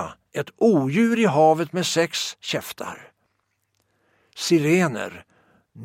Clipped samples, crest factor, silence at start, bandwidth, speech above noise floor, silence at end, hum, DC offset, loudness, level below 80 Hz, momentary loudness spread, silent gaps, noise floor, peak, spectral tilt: under 0.1%; 18 dB; 0 s; 16.5 kHz; 51 dB; 0 s; none; under 0.1%; -21 LUFS; -66 dBFS; 15 LU; none; -72 dBFS; -6 dBFS; -5 dB/octave